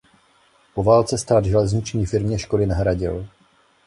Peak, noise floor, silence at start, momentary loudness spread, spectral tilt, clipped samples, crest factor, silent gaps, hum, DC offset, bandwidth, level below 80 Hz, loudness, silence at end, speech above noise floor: -4 dBFS; -58 dBFS; 0.75 s; 11 LU; -6.5 dB/octave; under 0.1%; 18 dB; none; none; under 0.1%; 11.5 kHz; -36 dBFS; -20 LUFS; 0.6 s; 39 dB